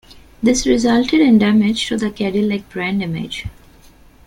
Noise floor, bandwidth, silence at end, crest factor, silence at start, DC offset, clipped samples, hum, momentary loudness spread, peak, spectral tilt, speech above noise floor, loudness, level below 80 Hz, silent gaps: -46 dBFS; 12 kHz; 0.8 s; 14 dB; 0.1 s; under 0.1%; under 0.1%; none; 12 LU; -2 dBFS; -5 dB/octave; 30 dB; -16 LUFS; -40 dBFS; none